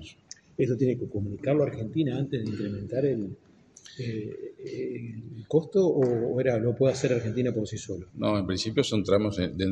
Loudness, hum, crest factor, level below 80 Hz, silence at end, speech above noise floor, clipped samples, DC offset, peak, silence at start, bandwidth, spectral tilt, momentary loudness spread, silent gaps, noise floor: -28 LUFS; none; 18 dB; -58 dBFS; 0 s; 23 dB; under 0.1%; under 0.1%; -10 dBFS; 0 s; 10 kHz; -6.5 dB/octave; 14 LU; none; -50 dBFS